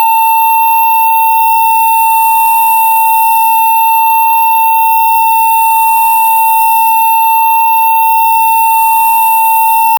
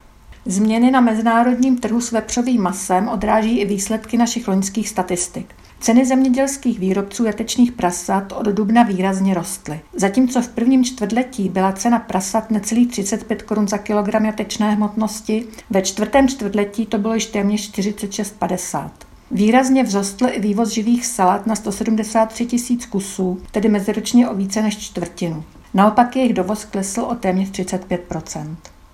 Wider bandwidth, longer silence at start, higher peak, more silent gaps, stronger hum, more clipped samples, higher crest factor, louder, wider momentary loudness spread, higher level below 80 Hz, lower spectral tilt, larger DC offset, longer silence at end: first, over 20 kHz vs 14 kHz; second, 0 s vs 0.3 s; about the same, 0 dBFS vs 0 dBFS; neither; neither; neither; second, 8 dB vs 18 dB; first, -7 LUFS vs -18 LUFS; second, 0 LU vs 10 LU; second, -62 dBFS vs -46 dBFS; second, 2 dB/octave vs -5 dB/octave; neither; second, 0 s vs 0.25 s